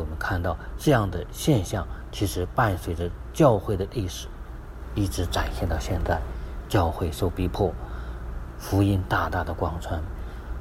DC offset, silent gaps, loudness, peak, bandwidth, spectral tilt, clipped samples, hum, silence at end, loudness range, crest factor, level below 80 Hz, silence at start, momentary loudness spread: under 0.1%; none; -26 LUFS; -6 dBFS; 16 kHz; -6 dB/octave; under 0.1%; none; 0 s; 3 LU; 20 dB; -36 dBFS; 0 s; 14 LU